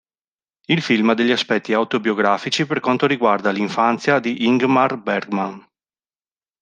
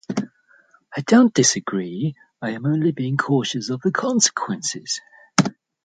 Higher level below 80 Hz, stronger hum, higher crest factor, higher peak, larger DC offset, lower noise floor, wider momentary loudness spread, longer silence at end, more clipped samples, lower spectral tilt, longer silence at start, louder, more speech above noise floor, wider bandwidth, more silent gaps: about the same, -66 dBFS vs -66 dBFS; neither; about the same, 18 dB vs 20 dB; about the same, -2 dBFS vs 0 dBFS; neither; first, under -90 dBFS vs -56 dBFS; second, 5 LU vs 13 LU; first, 1 s vs 0.35 s; neither; first, -5.5 dB/octave vs -4 dB/octave; first, 0.7 s vs 0.1 s; first, -18 LUFS vs -21 LUFS; first, over 72 dB vs 36 dB; about the same, 9.4 kHz vs 9.4 kHz; neither